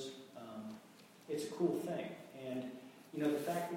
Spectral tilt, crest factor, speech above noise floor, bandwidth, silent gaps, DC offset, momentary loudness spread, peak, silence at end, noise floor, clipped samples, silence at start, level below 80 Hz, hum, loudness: -5.5 dB/octave; 20 dB; 22 dB; 16.5 kHz; none; under 0.1%; 17 LU; -22 dBFS; 0 s; -61 dBFS; under 0.1%; 0 s; -84 dBFS; none; -42 LUFS